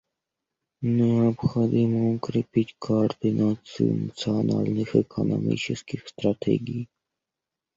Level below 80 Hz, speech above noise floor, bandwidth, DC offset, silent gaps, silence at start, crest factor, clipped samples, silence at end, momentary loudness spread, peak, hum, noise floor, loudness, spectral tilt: -58 dBFS; 63 dB; 7.8 kHz; under 0.1%; none; 0.8 s; 20 dB; under 0.1%; 0.9 s; 7 LU; -6 dBFS; none; -87 dBFS; -25 LUFS; -8 dB/octave